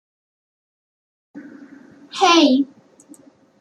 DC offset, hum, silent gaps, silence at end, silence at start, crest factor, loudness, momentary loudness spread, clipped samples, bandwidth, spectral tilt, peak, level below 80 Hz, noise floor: under 0.1%; none; none; 0.95 s; 1.35 s; 20 dB; -16 LUFS; 21 LU; under 0.1%; 10.5 kHz; -2 dB/octave; -2 dBFS; -76 dBFS; -48 dBFS